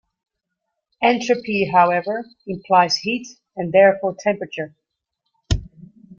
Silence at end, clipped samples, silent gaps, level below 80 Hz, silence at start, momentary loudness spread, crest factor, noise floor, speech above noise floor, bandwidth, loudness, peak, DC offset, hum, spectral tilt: 0.05 s; under 0.1%; none; -40 dBFS; 1 s; 16 LU; 18 dB; -79 dBFS; 60 dB; 7.6 kHz; -19 LUFS; -2 dBFS; under 0.1%; none; -5 dB/octave